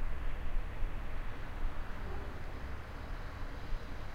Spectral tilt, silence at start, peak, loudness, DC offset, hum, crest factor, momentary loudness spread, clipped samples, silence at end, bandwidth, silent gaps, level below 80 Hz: -6.5 dB/octave; 0 s; -22 dBFS; -45 LUFS; under 0.1%; none; 14 dB; 3 LU; under 0.1%; 0 s; 6.6 kHz; none; -38 dBFS